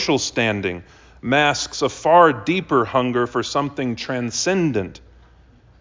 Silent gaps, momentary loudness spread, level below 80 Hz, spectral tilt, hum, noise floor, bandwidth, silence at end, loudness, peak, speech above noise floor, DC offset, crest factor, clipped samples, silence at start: none; 11 LU; -50 dBFS; -4 dB/octave; none; -50 dBFS; 7.6 kHz; 0.9 s; -19 LUFS; -2 dBFS; 31 dB; under 0.1%; 20 dB; under 0.1%; 0 s